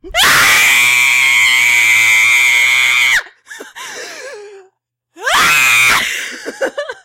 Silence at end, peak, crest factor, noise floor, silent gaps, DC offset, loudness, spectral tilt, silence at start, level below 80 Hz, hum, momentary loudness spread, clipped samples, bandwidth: 0.1 s; -2 dBFS; 12 dB; -59 dBFS; none; under 0.1%; -8 LUFS; 1 dB/octave; 0.05 s; -46 dBFS; none; 19 LU; under 0.1%; 16 kHz